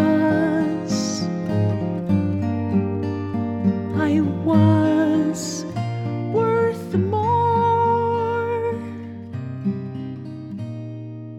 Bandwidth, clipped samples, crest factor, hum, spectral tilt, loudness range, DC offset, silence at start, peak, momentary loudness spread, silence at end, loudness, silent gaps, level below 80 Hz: 13 kHz; under 0.1%; 16 dB; none; -7 dB/octave; 3 LU; under 0.1%; 0 s; -4 dBFS; 14 LU; 0 s; -21 LUFS; none; -58 dBFS